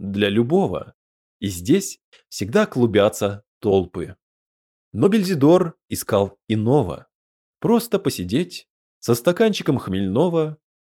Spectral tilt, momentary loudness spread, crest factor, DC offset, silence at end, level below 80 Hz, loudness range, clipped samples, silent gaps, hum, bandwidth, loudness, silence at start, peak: -6 dB/octave; 13 LU; 16 dB; under 0.1%; 0.25 s; -54 dBFS; 3 LU; under 0.1%; 0.94-1.40 s, 2.04-2.12 s, 3.47-3.61 s, 4.22-4.91 s, 7.15-7.53 s, 8.70-9.01 s; none; 18 kHz; -20 LUFS; 0 s; -4 dBFS